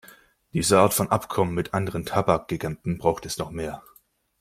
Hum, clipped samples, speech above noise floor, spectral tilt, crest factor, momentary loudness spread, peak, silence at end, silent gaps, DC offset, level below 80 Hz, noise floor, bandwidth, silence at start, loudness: none; under 0.1%; 29 dB; -5 dB/octave; 22 dB; 13 LU; -2 dBFS; 0.6 s; none; under 0.1%; -52 dBFS; -53 dBFS; 16.5 kHz; 0.55 s; -24 LUFS